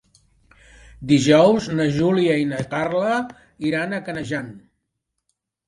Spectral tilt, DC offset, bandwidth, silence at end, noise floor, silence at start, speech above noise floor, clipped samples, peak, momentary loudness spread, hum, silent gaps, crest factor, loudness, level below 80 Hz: -6 dB/octave; under 0.1%; 11.5 kHz; 1.1 s; -78 dBFS; 1 s; 58 dB; under 0.1%; -2 dBFS; 14 LU; none; none; 20 dB; -20 LUFS; -54 dBFS